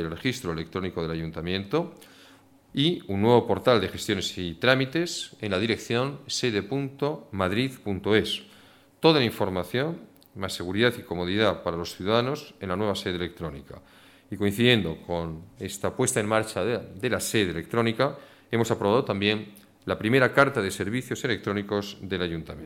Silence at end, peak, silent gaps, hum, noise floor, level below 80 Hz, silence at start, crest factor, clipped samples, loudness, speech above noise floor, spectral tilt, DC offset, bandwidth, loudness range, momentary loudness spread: 0 s; -6 dBFS; none; none; -55 dBFS; -56 dBFS; 0 s; 22 dB; under 0.1%; -26 LUFS; 29 dB; -5 dB/octave; under 0.1%; 17 kHz; 3 LU; 11 LU